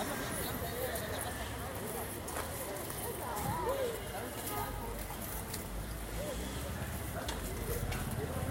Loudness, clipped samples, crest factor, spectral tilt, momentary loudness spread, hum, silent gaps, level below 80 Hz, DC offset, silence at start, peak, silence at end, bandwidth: -39 LUFS; under 0.1%; 16 dB; -4 dB/octave; 4 LU; none; none; -46 dBFS; under 0.1%; 0 s; -22 dBFS; 0 s; 17 kHz